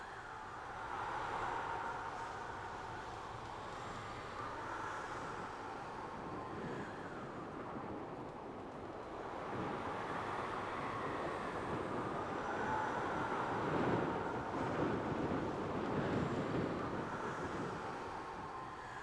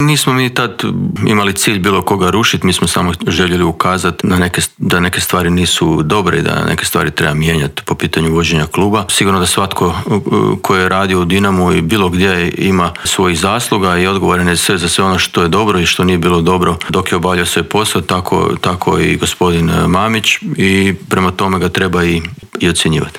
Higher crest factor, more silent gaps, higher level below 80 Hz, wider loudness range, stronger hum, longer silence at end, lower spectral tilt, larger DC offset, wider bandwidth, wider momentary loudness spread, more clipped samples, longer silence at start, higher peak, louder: first, 18 dB vs 12 dB; neither; second, -62 dBFS vs -38 dBFS; first, 7 LU vs 1 LU; neither; about the same, 0 s vs 0 s; first, -6 dB/octave vs -4.5 dB/octave; neither; second, 11 kHz vs 17 kHz; first, 9 LU vs 3 LU; neither; about the same, 0 s vs 0 s; second, -24 dBFS vs 0 dBFS; second, -42 LUFS vs -12 LUFS